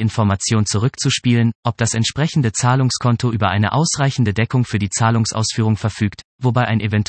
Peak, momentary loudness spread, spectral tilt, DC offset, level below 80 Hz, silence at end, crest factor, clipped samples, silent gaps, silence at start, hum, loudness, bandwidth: -2 dBFS; 3 LU; -5 dB/octave; under 0.1%; -50 dBFS; 0.05 s; 14 dB; under 0.1%; 1.55-1.63 s, 6.24-6.39 s; 0 s; none; -17 LUFS; 8.8 kHz